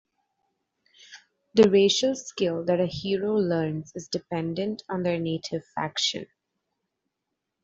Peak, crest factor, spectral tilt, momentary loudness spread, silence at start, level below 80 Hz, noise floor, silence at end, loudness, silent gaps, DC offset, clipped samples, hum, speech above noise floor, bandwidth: -6 dBFS; 22 dB; -5 dB/octave; 12 LU; 1.1 s; -64 dBFS; -83 dBFS; 1.4 s; -26 LUFS; none; under 0.1%; under 0.1%; none; 58 dB; 8 kHz